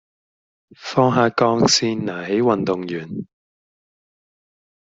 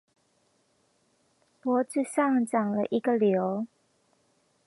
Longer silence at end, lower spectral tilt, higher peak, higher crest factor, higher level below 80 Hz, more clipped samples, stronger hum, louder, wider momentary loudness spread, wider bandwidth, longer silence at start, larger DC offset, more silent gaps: first, 1.6 s vs 1 s; second, -4.5 dB/octave vs -6.5 dB/octave; first, -2 dBFS vs -12 dBFS; about the same, 20 dB vs 18 dB; first, -58 dBFS vs -82 dBFS; neither; neither; first, -19 LUFS vs -27 LUFS; first, 14 LU vs 9 LU; second, 8.2 kHz vs 11.5 kHz; second, 0.8 s vs 1.65 s; neither; neither